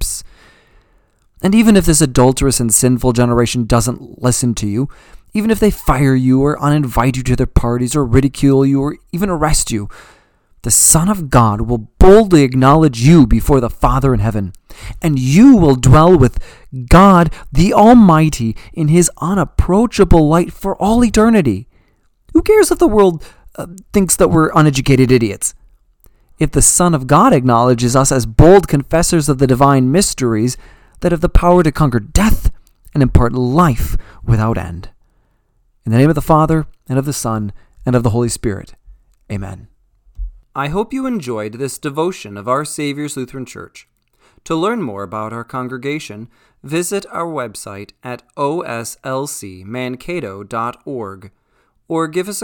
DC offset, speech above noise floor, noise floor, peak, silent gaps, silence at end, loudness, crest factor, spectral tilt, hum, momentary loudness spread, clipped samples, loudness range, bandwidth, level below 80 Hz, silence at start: under 0.1%; 46 dB; -58 dBFS; 0 dBFS; none; 0 s; -13 LUFS; 14 dB; -5.5 dB/octave; none; 17 LU; 0.4%; 12 LU; 19.5 kHz; -24 dBFS; 0 s